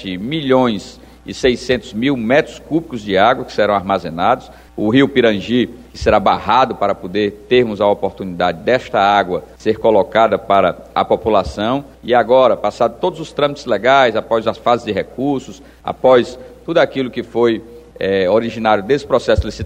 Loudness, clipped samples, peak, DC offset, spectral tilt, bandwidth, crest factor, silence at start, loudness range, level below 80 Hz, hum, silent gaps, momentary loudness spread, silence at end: -16 LUFS; under 0.1%; 0 dBFS; under 0.1%; -6 dB/octave; 10.5 kHz; 16 dB; 0 s; 2 LU; -38 dBFS; none; none; 9 LU; 0 s